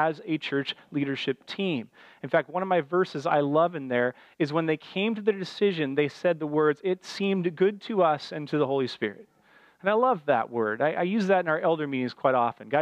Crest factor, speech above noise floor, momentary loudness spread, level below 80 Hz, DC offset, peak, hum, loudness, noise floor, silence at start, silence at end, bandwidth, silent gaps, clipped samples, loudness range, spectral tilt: 18 dB; 33 dB; 7 LU; -80 dBFS; under 0.1%; -8 dBFS; none; -27 LUFS; -59 dBFS; 0 s; 0 s; 9.8 kHz; none; under 0.1%; 2 LU; -6.5 dB/octave